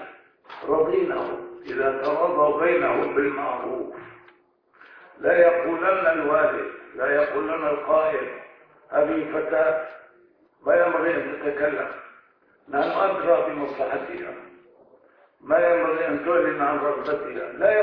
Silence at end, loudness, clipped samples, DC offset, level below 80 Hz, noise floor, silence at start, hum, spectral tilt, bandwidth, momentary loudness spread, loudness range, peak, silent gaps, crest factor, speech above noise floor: 0 s; -23 LUFS; under 0.1%; under 0.1%; -62 dBFS; -60 dBFS; 0 s; none; -8 dB/octave; 5.4 kHz; 14 LU; 3 LU; -6 dBFS; none; 18 dB; 37 dB